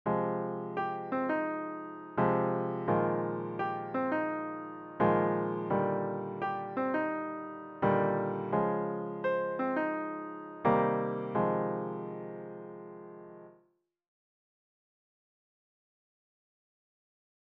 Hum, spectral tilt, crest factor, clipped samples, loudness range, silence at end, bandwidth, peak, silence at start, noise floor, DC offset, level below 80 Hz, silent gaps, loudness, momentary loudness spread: none; -10 dB/octave; 20 dB; under 0.1%; 6 LU; 4 s; 5.4 kHz; -14 dBFS; 0.05 s; -72 dBFS; under 0.1%; -68 dBFS; none; -33 LUFS; 14 LU